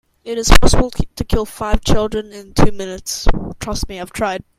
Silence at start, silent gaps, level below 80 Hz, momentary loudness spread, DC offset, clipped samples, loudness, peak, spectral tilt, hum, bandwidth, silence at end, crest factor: 0.25 s; none; -20 dBFS; 12 LU; under 0.1%; 0.6%; -19 LUFS; 0 dBFS; -4.5 dB/octave; none; 15.5 kHz; 0.2 s; 14 dB